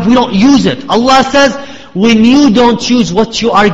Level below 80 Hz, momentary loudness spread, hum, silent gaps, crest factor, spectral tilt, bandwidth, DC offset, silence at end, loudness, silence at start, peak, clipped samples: -36 dBFS; 5 LU; none; none; 8 dB; -5 dB/octave; 8 kHz; under 0.1%; 0 s; -8 LUFS; 0 s; 0 dBFS; 0.6%